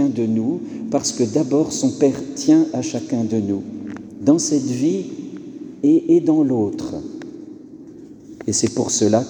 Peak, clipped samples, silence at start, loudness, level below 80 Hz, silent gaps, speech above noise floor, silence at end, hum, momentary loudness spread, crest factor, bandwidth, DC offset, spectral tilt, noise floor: -2 dBFS; under 0.1%; 0 s; -19 LUFS; -58 dBFS; none; 21 dB; 0 s; none; 19 LU; 16 dB; 11 kHz; under 0.1%; -5.5 dB/octave; -39 dBFS